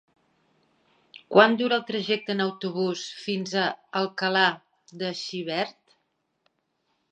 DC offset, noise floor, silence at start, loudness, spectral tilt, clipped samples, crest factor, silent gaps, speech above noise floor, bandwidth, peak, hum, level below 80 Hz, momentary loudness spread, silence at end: under 0.1%; -75 dBFS; 1.15 s; -25 LUFS; -4.5 dB/octave; under 0.1%; 26 dB; none; 50 dB; 9.2 kHz; -2 dBFS; none; -80 dBFS; 13 LU; 1.4 s